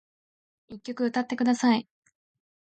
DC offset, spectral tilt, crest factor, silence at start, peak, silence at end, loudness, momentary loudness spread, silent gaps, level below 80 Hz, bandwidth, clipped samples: under 0.1%; -4.5 dB/octave; 18 dB; 0.7 s; -12 dBFS; 0.85 s; -26 LUFS; 18 LU; none; -74 dBFS; 9 kHz; under 0.1%